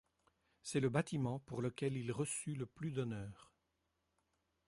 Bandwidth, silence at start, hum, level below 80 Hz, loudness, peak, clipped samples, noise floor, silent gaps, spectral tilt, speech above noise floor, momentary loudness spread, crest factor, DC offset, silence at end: 11.5 kHz; 0.65 s; none; -70 dBFS; -41 LUFS; -22 dBFS; under 0.1%; -85 dBFS; none; -5.5 dB/octave; 44 dB; 9 LU; 20 dB; under 0.1%; 1.25 s